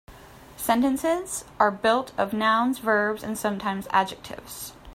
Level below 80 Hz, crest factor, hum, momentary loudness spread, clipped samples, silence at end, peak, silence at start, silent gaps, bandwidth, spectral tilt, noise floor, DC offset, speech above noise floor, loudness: -56 dBFS; 20 dB; none; 14 LU; under 0.1%; 0 s; -4 dBFS; 0.1 s; none; 16 kHz; -4 dB/octave; -47 dBFS; under 0.1%; 22 dB; -24 LUFS